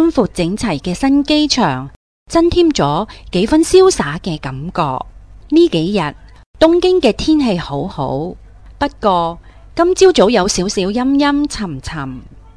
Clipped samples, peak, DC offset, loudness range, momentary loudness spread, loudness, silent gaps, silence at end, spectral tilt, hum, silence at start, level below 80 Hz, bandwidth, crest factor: under 0.1%; 0 dBFS; 0.3%; 2 LU; 14 LU; -14 LUFS; 1.96-2.26 s, 6.46-6.54 s; 0.2 s; -5 dB/octave; none; 0 s; -34 dBFS; 11 kHz; 14 dB